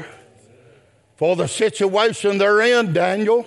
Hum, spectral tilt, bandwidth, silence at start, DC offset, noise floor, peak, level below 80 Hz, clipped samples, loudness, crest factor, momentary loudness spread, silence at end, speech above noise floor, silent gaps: none; -4.5 dB/octave; 11.5 kHz; 0 s; under 0.1%; -54 dBFS; -4 dBFS; -68 dBFS; under 0.1%; -18 LUFS; 14 dB; 5 LU; 0 s; 36 dB; none